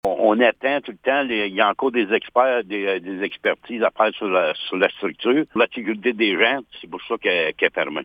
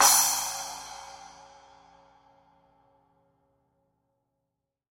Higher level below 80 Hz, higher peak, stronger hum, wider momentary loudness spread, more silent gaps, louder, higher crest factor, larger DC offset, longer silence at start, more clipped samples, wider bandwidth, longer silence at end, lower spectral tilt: first, -62 dBFS vs -68 dBFS; first, -2 dBFS vs -6 dBFS; second, none vs 60 Hz at -80 dBFS; second, 6 LU vs 27 LU; neither; first, -20 LUFS vs -25 LUFS; second, 18 dB vs 26 dB; neither; about the same, 0.05 s vs 0 s; neither; second, 6 kHz vs 16.5 kHz; second, 0 s vs 3.7 s; first, -6.5 dB/octave vs 2 dB/octave